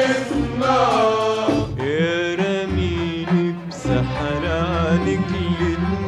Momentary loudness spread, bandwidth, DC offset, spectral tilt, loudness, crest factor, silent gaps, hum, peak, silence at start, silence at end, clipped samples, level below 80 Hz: 5 LU; 11 kHz; under 0.1%; -6.5 dB/octave; -20 LUFS; 14 dB; none; none; -6 dBFS; 0 s; 0 s; under 0.1%; -36 dBFS